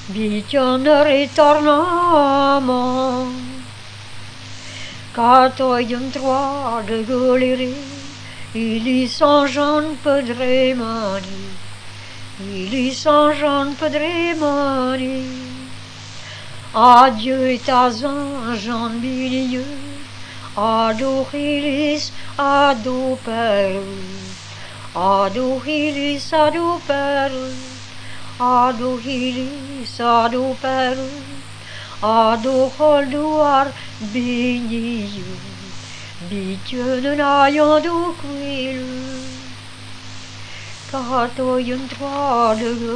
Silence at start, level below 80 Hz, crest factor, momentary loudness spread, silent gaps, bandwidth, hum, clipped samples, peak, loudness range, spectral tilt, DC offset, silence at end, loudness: 0 s; -52 dBFS; 18 dB; 20 LU; none; 10 kHz; none; under 0.1%; 0 dBFS; 6 LU; -5 dB/octave; 0.6%; 0 s; -17 LUFS